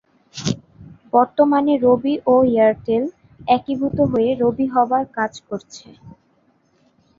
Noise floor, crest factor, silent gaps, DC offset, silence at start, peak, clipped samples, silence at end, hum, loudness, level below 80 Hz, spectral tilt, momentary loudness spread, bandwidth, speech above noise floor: -60 dBFS; 18 dB; none; under 0.1%; 0.35 s; -2 dBFS; under 0.1%; 1.1 s; none; -18 LUFS; -52 dBFS; -6.5 dB/octave; 15 LU; 7.6 kHz; 43 dB